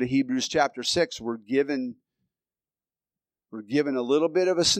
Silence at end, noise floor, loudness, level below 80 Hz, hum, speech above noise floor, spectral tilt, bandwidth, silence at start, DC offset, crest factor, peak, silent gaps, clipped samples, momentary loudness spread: 0 s; under -90 dBFS; -25 LUFS; -62 dBFS; none; over 65 dB; -3.5 dB/octave; 14.5 kHz; 0 s; under 0.1%; 18 dB; -8 dBFS; none; under 0.1%; 11 LU